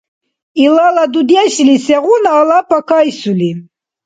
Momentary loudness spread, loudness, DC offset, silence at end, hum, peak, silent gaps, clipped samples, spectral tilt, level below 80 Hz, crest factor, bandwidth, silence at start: 7 LU; -10 LUFS; under 0.1%; 0.45 s; none; 0 dBFS; none; under 0.1%; -5 dB/octave; -58 dBFS; 10 dB; 9.4 kHz; 0.55 s